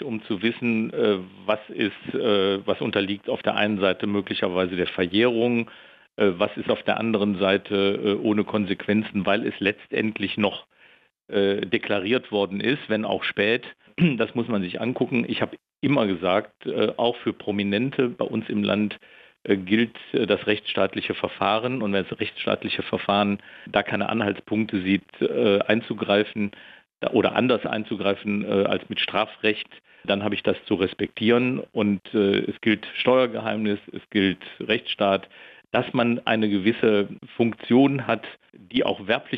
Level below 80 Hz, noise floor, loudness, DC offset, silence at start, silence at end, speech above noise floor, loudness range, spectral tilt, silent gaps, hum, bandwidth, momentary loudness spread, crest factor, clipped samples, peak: -64 dBFS; -57 dBFS; -24 LUFS; under 0.1%; 0 s; 0 s; 33 dB; 2 LU; -8.5 dB/octave; none; none; 5.8 kHz; 6 LU; 16 dB; under 0.1%; -6 dBFS